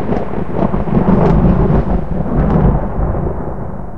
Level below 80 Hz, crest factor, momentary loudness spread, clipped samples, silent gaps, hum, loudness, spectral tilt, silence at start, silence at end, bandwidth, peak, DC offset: -20 dBFS; 14 dB; 9 LU; under 0.1%; none; none; -15 LUFS; -11 dB/octave; 0 s; 0 s; 5.4 kHz; 0 dBFS; 10%